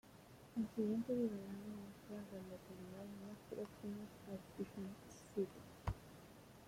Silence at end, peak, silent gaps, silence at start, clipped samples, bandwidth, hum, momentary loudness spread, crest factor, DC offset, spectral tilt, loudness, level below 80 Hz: 0 s; -28 dBFS; none; 0.05 s; under 0.1%; 16.5 kHz; none; 13 LU; 18 dB; under 0.1%; -7 dB/octave; -48 LUFS; -64 dBFS